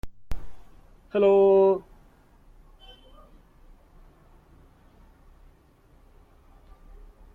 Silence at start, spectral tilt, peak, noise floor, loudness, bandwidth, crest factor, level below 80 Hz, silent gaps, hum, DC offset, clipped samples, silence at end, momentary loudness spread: 0.05 s; -8 dB/octave; -10 dBFS; -58 dBFS; -21 LUFS; 4.1 kHz; 18 dB; -48 dBFS; none; none; under 0.1%; under 0.1%; 5.55 s; 25 LU